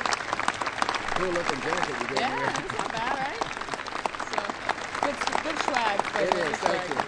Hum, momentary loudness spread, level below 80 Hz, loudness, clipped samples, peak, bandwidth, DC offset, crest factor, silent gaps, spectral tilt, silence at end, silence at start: none; 5 LU; -52 dBFS; -28 LUFS; under 0.1%; -6 dBFS; 11 kHz; under 0.1%; 22 dB; none; -3 dB/octave; 0 s; 0 s